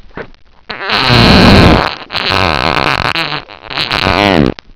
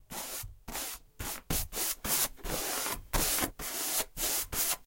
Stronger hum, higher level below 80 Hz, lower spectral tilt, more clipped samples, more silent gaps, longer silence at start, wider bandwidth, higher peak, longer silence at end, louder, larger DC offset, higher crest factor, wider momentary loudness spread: neither; first, -22 dBFS vs -46 dBFS; first, -6 dB/octave vs -1.5 dB/octave; first, 3% vs under 0.1%; neither; first, 0.15 s vs 0 s; second, 5.4 kHz vs 17 kHz; first, 0 dBFS vs -14 dBFS; about the same, 0 s vs 0.05 s; first, -9 LUFS vs -32 LUFS; neither; second, 10 dB vs 20 dB; first, 17 LU vs 10 LU